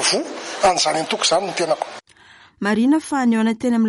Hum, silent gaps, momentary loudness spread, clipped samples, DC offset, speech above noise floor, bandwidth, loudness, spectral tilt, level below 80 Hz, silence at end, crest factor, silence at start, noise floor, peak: none; none; 9 LU; under 0.1%; under 0.1%; 30 dB; 11.5 kHz; -19 LUFS; -3 dB/octave; -58 dBFS; 0 s; 14 dB; 0 s; -49 dBFS; -4 dBFS